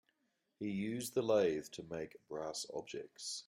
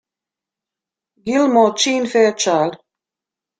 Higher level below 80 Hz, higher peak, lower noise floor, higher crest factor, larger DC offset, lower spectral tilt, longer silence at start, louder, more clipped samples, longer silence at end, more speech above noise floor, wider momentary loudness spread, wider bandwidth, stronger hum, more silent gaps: second, -76 dBFS vs -64 dBFS; second, -22 dBFS vs -2 dBFS; second, -83 dBFS vs -87 dBFS; about the same, 18 dB vs 18 dB; neither; first, -4.5 dB/octave vs -3 dB/octave; second, 0.6 s vs 1.25 s; second, -40 LUFS vs -16 LUFS; neither; second, 0.05 s vs 0.85 s; second, 44 dB vs 72 dB; first, 13 LU vs 8 LU; first, 16 kHz vs 9.4 kHz; neither; neither